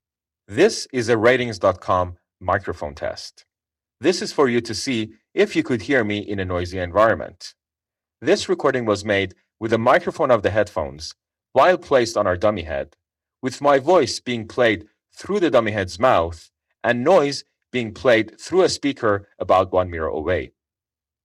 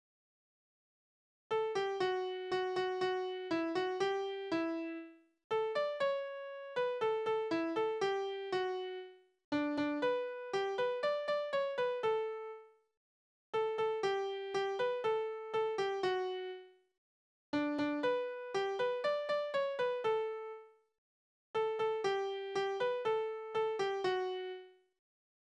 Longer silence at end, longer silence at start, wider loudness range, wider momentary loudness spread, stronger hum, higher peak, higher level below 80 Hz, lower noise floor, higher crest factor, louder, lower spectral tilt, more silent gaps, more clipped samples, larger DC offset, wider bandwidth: about the same, 0.75 s vs 0.85 s; second, 0.5 s vs 1.5 s; about the same, 3 LU vs 2 LU; first, 13 LU vs 7 LU; neither; first, -6 dBFS vs -22 dBFS; first, -52 dBFS vs -80 dBFS; about the same, -90 dBFS vs under -90 dBFS; about the same, 14 dB vs 14 dB; first, -20 LUFS vs -37 LUFS; about the same, -5 dB/octave vs -4.5 dB/octave; second, none vs 5.44-5.50 s, 9.44-9.52 s, 12.97-13.53 s, 16.98-17.53 s, 20.98-21.54 s; neither; neither; first, 12.5 kHz vs 9.8 kHz